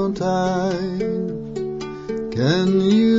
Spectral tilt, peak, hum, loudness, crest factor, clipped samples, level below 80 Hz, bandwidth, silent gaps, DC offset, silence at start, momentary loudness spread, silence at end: -7 dB/octave; -6 dBFS; none; -21 LUFS; 14 dB; under 0.1%; -48 dBFS; 7.8 kHz; none; under 0.1%; 0 s; 11 LU; 0 s